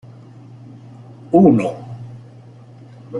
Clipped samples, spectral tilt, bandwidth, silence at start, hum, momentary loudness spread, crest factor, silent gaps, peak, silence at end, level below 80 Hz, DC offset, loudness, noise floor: under 0.1%; -9.5 dB/octave; 10.5 kHz; 1.3 s; none; 28 LU; 18 dB; none; -2 dBFS; 0 s; -56 dBFS; under 0.1%; -15 LUFS; -41 dBFS